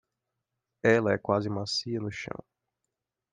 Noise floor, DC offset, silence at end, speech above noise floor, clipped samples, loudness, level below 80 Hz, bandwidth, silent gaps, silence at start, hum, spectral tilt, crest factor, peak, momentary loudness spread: -86 dBFS; under 0.1%; 1 s; 58 dB; under 0.1%; -28 LUFS; -68 dBFS; 9.6 kHz; none; 0.85 s; none; -5.5 dB/octave; 22 dB; -8 dBFS; 14 LU